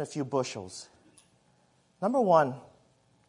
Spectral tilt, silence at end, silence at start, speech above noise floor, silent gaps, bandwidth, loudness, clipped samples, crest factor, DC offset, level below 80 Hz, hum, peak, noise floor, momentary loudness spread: -5.5 dB/octave; 0.65 s; 0 s; 39 dB; none; 11 kHz; -28 LUFS; under 0.1%; 22 dB; under 0.1%; -78 dBFS; none; -10 dBFS; -67 dBFS; 21 LU